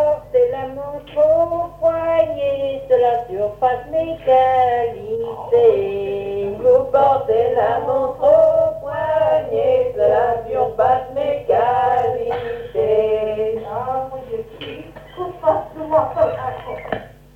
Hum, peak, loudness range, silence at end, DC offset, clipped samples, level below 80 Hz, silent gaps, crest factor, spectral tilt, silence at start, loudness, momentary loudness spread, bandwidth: none; -2 dBFS; 6 LU; 0.25 s; under 0.1%; under 0.1%; -46 dBFS; none; 14 dB; -7 dB/octave; 0 s; -18 LUFS; 13 LU; 6.4 kHz